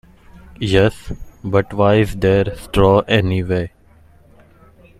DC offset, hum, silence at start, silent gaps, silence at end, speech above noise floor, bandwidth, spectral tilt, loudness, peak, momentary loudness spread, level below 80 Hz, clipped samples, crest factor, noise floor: under 0.1%; none; 0.6 s; none; 1.3 s; 33 dB; 14 kHz; -7 dB/octave; -16 LUFS; 0 dBFS; 15 LU; -36 dBFS; under 0.1%; 18 dB; -48 dBFS